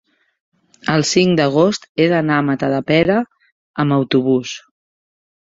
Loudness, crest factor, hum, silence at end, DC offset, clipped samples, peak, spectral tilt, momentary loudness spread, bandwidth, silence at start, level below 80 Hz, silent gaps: -16 LUFS; 16 dB; none; 1 s; under 0.1%; under 0.1%; -2 dBFS; -5.5 dB/octave; 13 LU; 8 kHz; 0.85 s; -54 dBFS; 1.89-1.95 s, 3.52-3.74 s